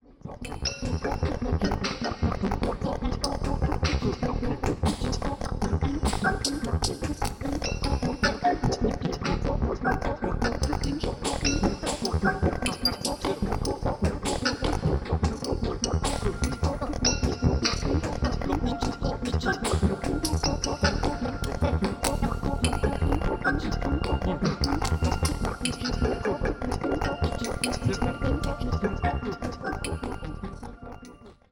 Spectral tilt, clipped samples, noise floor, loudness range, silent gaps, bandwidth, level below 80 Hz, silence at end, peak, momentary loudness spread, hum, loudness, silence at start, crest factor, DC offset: -5 dB/octave; under 0.1%; -48 dBFS; 2 LU; none; 18 kHz; -34 dBFS; 0.2 s; -6 dBFS; 5 LU; none; -28 LUFS; 0.1 s; 20 dB; under 0.1%